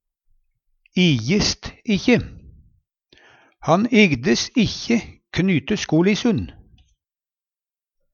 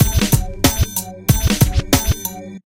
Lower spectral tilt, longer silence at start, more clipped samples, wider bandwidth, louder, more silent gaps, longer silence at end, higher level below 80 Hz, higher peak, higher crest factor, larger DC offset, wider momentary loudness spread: about the same, -5 dB/octave vs -4.5 dB/octave; first, 0.95 s vs 0 s; neither; second, 7.4 kHz vs 17 kHz; about the same, -19 LUFS vs -17 LUFS; neither; first, 1.6 s vs 0.1 s; second, -46 dBFS vs -24 dBFS; about the same, 0 dBFS vs 0 dBFS; first, 22 dB vs 16 dB; second, under 0.1% vs 0.1%; first, 12 LU vs 7 LU